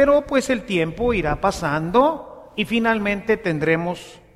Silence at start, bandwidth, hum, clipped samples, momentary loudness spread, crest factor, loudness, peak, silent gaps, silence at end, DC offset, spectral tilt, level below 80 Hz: 0 s; 14.5 kHz; none; under 0.1%; 9 LU; 16 dB; -21 LUFS; -4 dBFS; none; 0.2 s; under 0.1%; -5.5 dB/octave; -40 dBFS